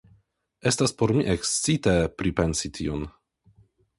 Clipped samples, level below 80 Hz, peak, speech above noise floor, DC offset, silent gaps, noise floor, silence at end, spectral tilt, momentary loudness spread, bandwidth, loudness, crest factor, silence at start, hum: under 0.1%; -42 dBFS; -6 dBFS; 39 dB; under 0.1%; none; -64 dBFS; 0.9 s; -4.5 dB/octave; 8 LU; 11.5 kHz; -25 LUFS; 20 dB; 0.65 s; none